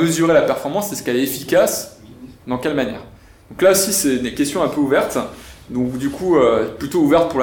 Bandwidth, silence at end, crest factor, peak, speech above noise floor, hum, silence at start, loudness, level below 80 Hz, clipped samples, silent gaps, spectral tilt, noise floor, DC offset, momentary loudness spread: 19 kHz; 0 s; 14 dB; -4 dBFS; 23 dB; none; 0 s; -18 LUFS; -46 dBFS; under 0.1%; none; -4 dB/octave; -40 dBFS; under 0.1%; 13 LU